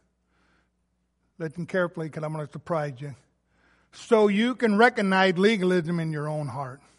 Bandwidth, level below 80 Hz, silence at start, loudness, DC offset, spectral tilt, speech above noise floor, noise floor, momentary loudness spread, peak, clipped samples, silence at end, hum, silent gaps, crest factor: 11.5 kHz; -70 dBFS; 1.4 s; -24 LUFS; under 0.1%; -6.5 dB/octave; 49 dB; -73 dBFS; 16 LU; -6 dBFS; under 0.1%; 0.25 s; none; none; 20 dB